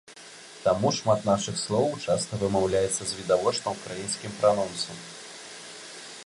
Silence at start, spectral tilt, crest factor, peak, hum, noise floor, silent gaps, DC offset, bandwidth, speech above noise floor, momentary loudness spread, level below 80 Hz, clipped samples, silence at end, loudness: 0.1 s; -4 dB/octave; 18 dB; -8 dBFS; none; -47 dBFS; none; under 0.1%; 11.5 kHz; 20 dB; 16 LU; -56 dBFS; under 0.1%; 0 s; -26 LUFS